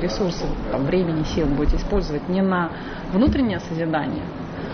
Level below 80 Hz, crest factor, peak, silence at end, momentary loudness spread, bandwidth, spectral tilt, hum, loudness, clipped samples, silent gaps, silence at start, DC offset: -30 dBFS; 14 dB; -8 dBFS; 0 s; 8 LU; 6.6 kHz; -7 dB/octave; none; -23 LUFS; under 0.1%; none; 0 s; under 0.1%